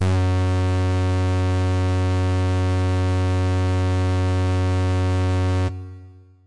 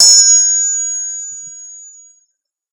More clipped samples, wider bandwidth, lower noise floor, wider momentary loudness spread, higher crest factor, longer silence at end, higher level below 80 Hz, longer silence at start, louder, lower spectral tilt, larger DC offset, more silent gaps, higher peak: second, under 0.1% vs 0.3%; second, 10.5 kHz vs over 20 kHz; second, -44 dBFS vs -66 dBFS; second, 0 LU vs 25 LU; second, 6 dB vs 14 dB; second, 0 s vs 0.85 s; first, -52 dBFS vs -68 dBFS; about the same, 0 s vs 0 s; second, -21 LUFS vs -9 LUFS; first, -7 dB/octave vs 5.5 dB/octave; first, 1% vs under 0.1%; neither; second, -14 dBFS vs 0 dBFS